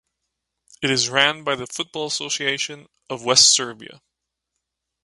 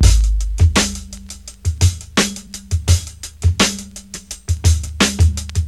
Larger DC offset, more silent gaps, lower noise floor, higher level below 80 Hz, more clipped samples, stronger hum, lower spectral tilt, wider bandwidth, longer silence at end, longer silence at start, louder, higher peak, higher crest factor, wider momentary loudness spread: second, under 0.1% vs 0.2%; neither; first, -80 dBFS vs -35 dBFS; second, -64 dBFS vs -20 dBFS; neither; neither; second, -1 dB/octave vs -4 dB/octave; second, 11.5 kHz vs 13.5 kHz; first, 1.1 s vs 0 s; first, 0.8 s vs 0 s; about the same, -19 LUFS vs -17 LUFS; about the same, 0 dBFS vs 0 dBFS; first, 24 dB vs 16 dB; about the same, 16 LU vs 17 LU